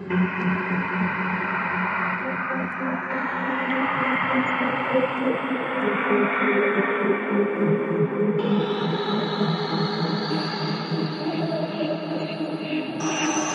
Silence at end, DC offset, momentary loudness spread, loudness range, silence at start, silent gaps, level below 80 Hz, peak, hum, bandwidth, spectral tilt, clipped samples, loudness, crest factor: 0 s; under 0.1%; 5 LU; 4 LU; 0 s; none; -72 dBFS; -8 dBFS; none; 10.5 kHz; -5 dB/octave; under 0.1%; -24 LUFS; 16 dB